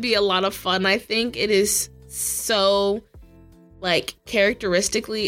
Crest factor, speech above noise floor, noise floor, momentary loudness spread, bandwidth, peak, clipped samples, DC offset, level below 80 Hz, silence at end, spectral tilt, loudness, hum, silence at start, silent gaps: 16 dB; 27 dB; -49 dBFS; 6 LU; 17 kHz; -6 dBFS; under 0.1%; under 0.1%; -50 dBFS; 0 s; -2.5 dB/octave; -21 LUFS; none; 0 s; none